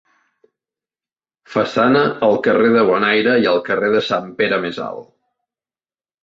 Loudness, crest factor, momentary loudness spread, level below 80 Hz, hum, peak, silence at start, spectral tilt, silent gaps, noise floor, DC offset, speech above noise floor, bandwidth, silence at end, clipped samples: -16 LUFS; 16 dB; 10 LU; -60 dBFS; none; -2 dBFS; 1.5 s; -6 dB/octave; none; under -90 dBFS; under 0.1%; over 74 dB; 7.6 kHz; 1.2 s; under 0.1%